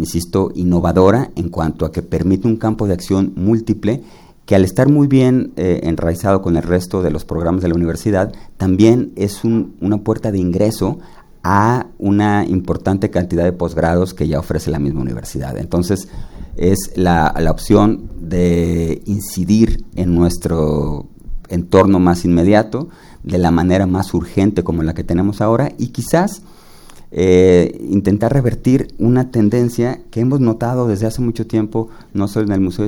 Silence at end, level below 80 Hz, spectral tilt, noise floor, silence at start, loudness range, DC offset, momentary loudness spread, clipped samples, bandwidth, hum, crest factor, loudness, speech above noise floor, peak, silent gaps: 0 s; -30 dBFS; -7.5 dB/octave; -38 dBFS; 0 s; 3 LU; under 0.1%; 9 LU; under 0.1%; 18 kHz; none; 14 dB; -16 LUFS; 24 dB; 0 dBFS; none